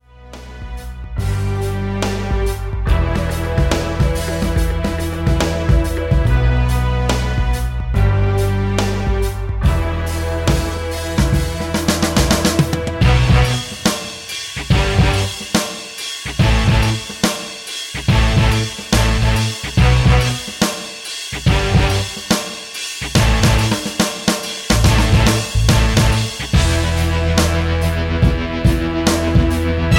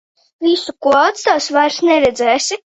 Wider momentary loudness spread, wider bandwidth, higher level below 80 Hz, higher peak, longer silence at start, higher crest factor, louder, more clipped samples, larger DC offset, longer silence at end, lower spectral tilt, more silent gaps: first, 9 LU vs 4 LU; first, 17 kHz vs 8.4 kHz; first, -20 dBFS vs -52 dBFS; about the same, 0 dBFS vs 0 dBFS; second, 0.2 s vs 0.4 s; about the same, 16 dB vs 14 dB; second, -17 LUFS vs -14 LUFS; neither; neither; second, 0 s vs 0.2 s; first, -5 dB/octave vs -2 dB/octave; neither